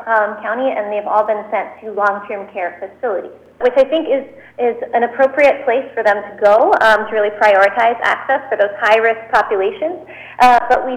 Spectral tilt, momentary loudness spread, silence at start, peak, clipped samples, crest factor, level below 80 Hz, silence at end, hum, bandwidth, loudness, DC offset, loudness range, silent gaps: -4 dB/octave; 13 LU; 0 s; -2 dBFS; under 0.1%; 12 dB; -52 dBFS; 0 s; none; 13 kHz; -15 LUFS; under 0.1%; 6 LU; none